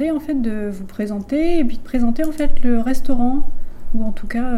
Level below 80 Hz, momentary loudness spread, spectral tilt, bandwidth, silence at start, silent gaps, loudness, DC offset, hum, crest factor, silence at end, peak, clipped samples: -24 dBFS; 7 LU; -7 dB/octave; 4.7 kHz; 0 s; none; -22 LUFS; under 0.1%; none; 12 dB; 0 s; -2 dBFS; under 0.1%